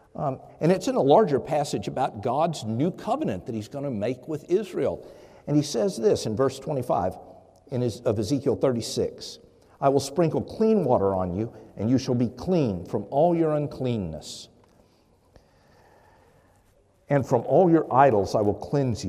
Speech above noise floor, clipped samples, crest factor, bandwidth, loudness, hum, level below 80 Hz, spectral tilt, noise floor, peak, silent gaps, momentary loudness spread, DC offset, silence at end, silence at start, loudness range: 37 dB; under 0.1%; 20 dB; 15 kHz; -25 LUFS; none; -60 dBFS; -6.5 dB/octave; -61 dBFS; -4 dBFS; none; 12 LU; under 0.1%; 0 s; 0.15 s; 5 LU